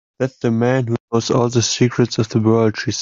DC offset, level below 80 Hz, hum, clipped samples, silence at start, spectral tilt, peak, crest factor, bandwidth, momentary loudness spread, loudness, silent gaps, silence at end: under 0.1%; -54 dBFS; none; under 0.1%; 0.2 s; -5.5 dB/octave; -2 dBFS; 14 dB; 7.6 kHz; 5 LU; -17 LUFS; 1.00-1.08 s; 0 s